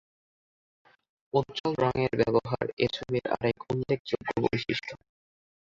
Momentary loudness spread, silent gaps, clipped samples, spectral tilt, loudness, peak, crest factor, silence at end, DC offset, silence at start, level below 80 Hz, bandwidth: 6 LU; 1.60-1.64 s, 2.73-2.77 s, 3.99-4.05 s; under 0.1%; -7 dB/octave; -29 LUFS; -10 dBFS; 20 dB; 0.8 s; under 0.1%; 1.35 s; -58 dBFS; 7.6 kHz